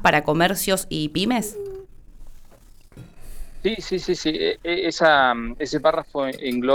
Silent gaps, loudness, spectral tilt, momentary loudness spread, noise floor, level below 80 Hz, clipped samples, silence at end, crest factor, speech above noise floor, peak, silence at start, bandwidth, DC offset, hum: none; -22 LUFS; -4 dB/octave; 10 LU; -47 dBFS; -42 dBFS; under 0.1%; 0 s; 18 dB; 25 dB; -4 dBFS; 0 s; over 20 kHz; under 0.1%; none